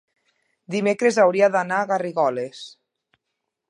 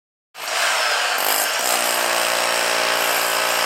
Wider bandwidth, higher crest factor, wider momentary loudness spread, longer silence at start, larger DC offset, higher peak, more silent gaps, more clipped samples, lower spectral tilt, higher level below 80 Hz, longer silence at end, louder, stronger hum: second, 11 kHz vs 16 kHz; about the same, 18 dB vs 16 dB; first, 16 LU vs 1 LU; first, 0.7 s vs 0.35 s; neither; about the same, -4 dBFS vs -4 dBFS; neither; neither; first, -5 dB/octave vs 1 dB/octave; about the same, -78 dBFS vs -78 dBFS; first, 1 s vs 0 s; about the same, -20 LUFS vs -18 LUFS; neither